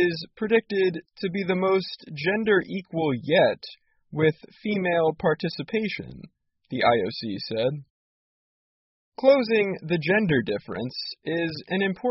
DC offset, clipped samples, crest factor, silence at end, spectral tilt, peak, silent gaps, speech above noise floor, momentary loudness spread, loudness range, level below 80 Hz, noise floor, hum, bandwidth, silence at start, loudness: under 0.1%; under 0.1%; 20 dB; 0 s; -4 dB/octave; -6 dBFS; 7.90-9.12 s; over 65 dB; 11 LU; 3 LU; -62 dBFS; under -90 dBFS; none; 6 kHz; 0 s; -25 LUFS